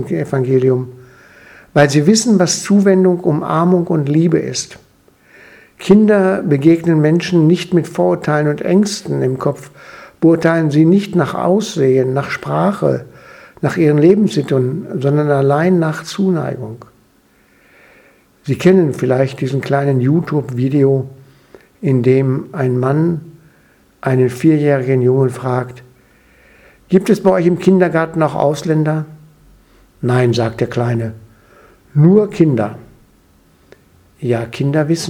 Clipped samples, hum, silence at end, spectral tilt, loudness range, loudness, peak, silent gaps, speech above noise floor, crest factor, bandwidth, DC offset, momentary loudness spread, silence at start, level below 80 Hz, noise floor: under 0.1%; none; 0 s; -6.5 dB/octave; 4 LU; -14 LUFS; 0 dBFS; none; 39 dB; 14 dB; 15 kHz; under 0.1%; 10 LU; 0 s; -54 dBFS; -53 dBFS